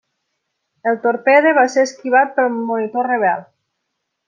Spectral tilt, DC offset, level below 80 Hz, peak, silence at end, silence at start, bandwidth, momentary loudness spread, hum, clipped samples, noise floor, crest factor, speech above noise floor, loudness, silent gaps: -4.5 dB/octave; under 0.1%; -74 dBFS; -2 dBFS; 0.85 s; 0.85 s; 9 kHz; 9 LU; none; under 0.1%; -75 dBFS; 16 dB; 60 dB; -16 LUFS; none